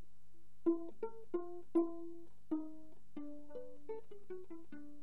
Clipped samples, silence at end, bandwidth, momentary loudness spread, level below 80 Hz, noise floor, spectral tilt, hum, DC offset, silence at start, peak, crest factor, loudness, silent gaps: under 0.1%; 0 s; 3.7 kHz; 16 LU; -76 dBFS; -72 dBFS; -9 dB/octave; none; 0.8%; 0.65 s; -24 dBFS; 20 dB; -44 LUFS; none